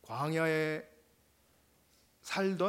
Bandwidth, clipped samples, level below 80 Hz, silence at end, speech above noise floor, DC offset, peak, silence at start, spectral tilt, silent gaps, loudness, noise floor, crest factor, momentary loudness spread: 16 kHz; under 0.1%; -76 dBFS; 0 s; 36 dB; under 0.1%; -18 dBFS; 0.05 s; -5.5 dB/octave; none; -34 LUFS; -69 dBFS; 18 dB; 19 LU